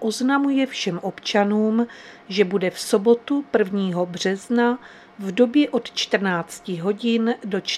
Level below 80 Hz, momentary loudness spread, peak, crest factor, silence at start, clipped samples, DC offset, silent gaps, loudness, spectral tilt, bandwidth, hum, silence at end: -70 dBFS; 9 LU; -4 dBFS; 18 dB; 0 s; under 0.1%; under 0.1%; none; -22 LUFS; -5 dB/octave; 14 kHz; none; 0 s